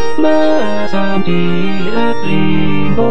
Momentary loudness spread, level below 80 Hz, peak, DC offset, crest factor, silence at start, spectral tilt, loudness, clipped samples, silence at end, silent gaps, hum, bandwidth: 5 LU; -38 dBFS; 0 dBFS; 30%; 14 dB; 0 s; -7.5 dB/octave; -15 LUFS; under 0.1%; 0 s; none; none; 8.8 kHz